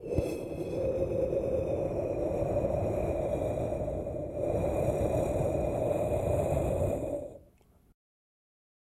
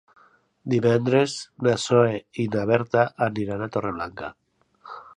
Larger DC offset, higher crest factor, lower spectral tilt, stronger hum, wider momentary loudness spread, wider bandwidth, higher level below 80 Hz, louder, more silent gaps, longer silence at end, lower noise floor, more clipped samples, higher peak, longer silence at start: neither; second, 14 dB vs 20 dB; first, -8 dB/octave vs -6 dB/octave; neither; second, 6 LU vs 17 LU; first, 15 kHz vs 11 kHz; first, -44 dBFS vs -58 dBFS; second, -32 LUFS vs -23 LUFS; neither; first, 1.5 s vs 0.1 s; first, -62 dBFS vs -57 dBFS; neither; second, -16 dBFS vs -4 dBFS; second, 0 s vs 0.65 s